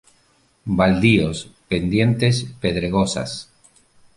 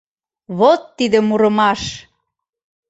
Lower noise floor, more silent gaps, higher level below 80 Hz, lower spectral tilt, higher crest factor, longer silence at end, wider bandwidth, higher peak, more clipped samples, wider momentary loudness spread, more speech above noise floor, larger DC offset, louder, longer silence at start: second, -60 dBFS vs -75 dBFS; neither; first, -42 dBFS vs -50 dBFS; about the same, -6 dB/octave vs -5 dB/octave; about the same, 18 dB vs 16 dB; second, 0.75 s vs 0.9 s; first, 11.5 kHz vs 8 kHz; about the same, -2 dBFS vs -2 dBFS; neither; about the same, 14 LU vs 14 LU; second, 41 dB vs 60 dB; neither; second, -19 LUFS vs -15 LUFS; first, 0.65 s vs 0.5 s